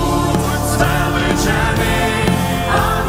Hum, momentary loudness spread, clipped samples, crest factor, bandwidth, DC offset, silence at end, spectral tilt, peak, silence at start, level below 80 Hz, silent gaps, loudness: none; 2 LU; under 0.1%; 14 dB; 16.5 kHz; under 0.1%; 0 s; -5 dB/octave; -2 dBFS; 0 s; -24 dBFS; none; -16 LUFS